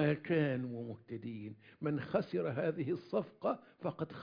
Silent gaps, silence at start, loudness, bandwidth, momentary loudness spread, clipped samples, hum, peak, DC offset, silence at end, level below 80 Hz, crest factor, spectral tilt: none; 0 s; -38 LUFS; 5.2 kHz; 12 LU; under 0.1%; none; -20 dBFS; under 0.1%; 0 s; -74 dBFS; 18 dB; -7 dB/octave